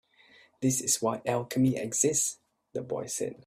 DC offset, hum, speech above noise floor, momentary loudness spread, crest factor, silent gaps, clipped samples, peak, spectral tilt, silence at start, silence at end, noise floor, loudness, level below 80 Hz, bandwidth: under 0.1%; none; 31 dB; 11 LU; 20 dB; none; under 0.1%; -10 dBFS; -4 dB/octave; 0.6 s; 0.15 s; -60 dBFS; -28 LUFS; -66 dBFS; 16 kHz